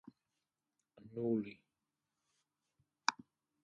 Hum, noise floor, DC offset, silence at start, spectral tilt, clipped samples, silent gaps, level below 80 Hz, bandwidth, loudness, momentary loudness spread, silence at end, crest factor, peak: none; -90 dBFS; under 0.1%; 1 s; -4 dB/octave; under 0.1%; none; -84 dBFS; 9.4 kHz; -40 LUFS; 13 LU; 0.5 s; 34 dB; -12 dBFS